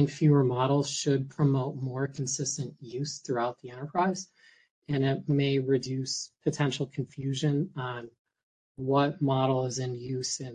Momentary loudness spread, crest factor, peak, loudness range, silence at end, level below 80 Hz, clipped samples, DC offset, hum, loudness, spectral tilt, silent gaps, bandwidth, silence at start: 10 LU; 16 dB; -12 dBFS; 3 LU; 0 s; -68 dBFS; under 0.1%; under 0.1%; none; -29 LUFS; -5.5 dB/octave; 4.70-4.82 s, 8.19-8.25 s, 8.43-8.75 s; 9.8 kHz; 0 s